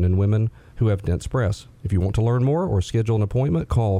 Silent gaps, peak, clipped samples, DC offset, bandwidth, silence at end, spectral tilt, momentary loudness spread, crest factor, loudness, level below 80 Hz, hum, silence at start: none; -8 dBFS; under 0.1%; under 0.1%; 11 kHz; 0 s; -8 dB/octave; 5 LU; 12 dB; -22 LUFS; -38 dBFS; none; 0 s